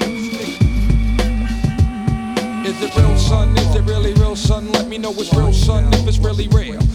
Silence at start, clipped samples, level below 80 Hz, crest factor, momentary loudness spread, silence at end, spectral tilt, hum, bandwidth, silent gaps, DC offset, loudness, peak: 0 s; under 0.1%; -18 dBFS; 14 dB; 7 LU; 0 s; -6 dB/octave; none; 13.5 kHz; none; under 0.1%; -17 LUFS; 0 dBFS